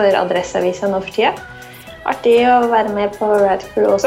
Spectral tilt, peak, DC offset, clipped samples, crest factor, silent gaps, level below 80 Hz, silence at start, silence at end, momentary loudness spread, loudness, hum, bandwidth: -5 dB/octave; -2 dBFS; under 0.1%; under 0.1%; 14 dB; none; -48 dBFS; 0 s; 0 s; 15 LU; -16 LUFS; none; 16 kHz